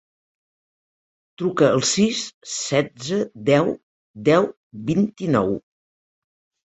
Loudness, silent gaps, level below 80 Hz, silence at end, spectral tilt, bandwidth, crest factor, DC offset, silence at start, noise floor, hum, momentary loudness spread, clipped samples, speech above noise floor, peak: -21 LUFS; 2.34-2.41 s, 3.83-4.14 s, 4.57-4.71 s; -58 dBFS; 1.1 s; -4.5 dB/octave; 8.2 kHz; 18 dB; under 0.1%; 1.4 s; under -90 dBFS; none; 10 LU; under 0.1%; over 70 dB; -4 dBFS